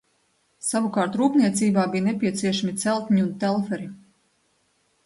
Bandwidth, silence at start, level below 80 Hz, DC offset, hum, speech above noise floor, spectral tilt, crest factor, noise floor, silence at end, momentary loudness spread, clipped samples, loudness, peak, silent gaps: 11.5 kHz; 0.65 s; -66 dBFS; under 0.1%; none; 45 dB; -5 dB/octave; 18 dB; -67 dBFS; 1.1 s; 8 LU; under 0.1%; -23 LUFS; -8 dBFS; none